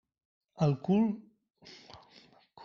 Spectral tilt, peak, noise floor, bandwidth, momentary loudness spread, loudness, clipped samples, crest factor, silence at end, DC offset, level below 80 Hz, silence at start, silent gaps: -8.5 dB/octave; -16 dBFS; -61 dBFS; 7 kHz; 25 LU; -31 LUFS; under 0.1%; 18 dB; 0 s; under 0.1%; -68 dBFS; 0.6 s; none